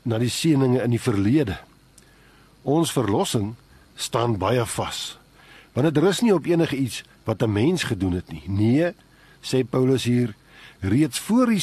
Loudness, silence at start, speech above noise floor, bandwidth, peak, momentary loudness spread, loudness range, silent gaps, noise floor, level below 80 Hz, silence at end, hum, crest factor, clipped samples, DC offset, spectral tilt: -23 LUFS; 0.05 s; 32 dB; 13 kHz; -6 dBFS; 10 LU; 3 LU; none; -53 dBFS; -52 dBFS; 0 s; none; 16 dB; under 0.1%; under 0.1%; -6 dB/octave